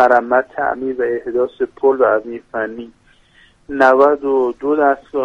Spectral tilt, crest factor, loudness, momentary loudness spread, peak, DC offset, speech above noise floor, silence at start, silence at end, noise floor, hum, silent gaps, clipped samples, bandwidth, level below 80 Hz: -6.5 dB/octave; 16 dB; -16 LUFS; 12 LU; 0 dBFS; under 0.1%; 35 dB; 0 s; 0 s; -51 dBFS; none; none; under 0.1%; 7.2 kHz; -54 dBFS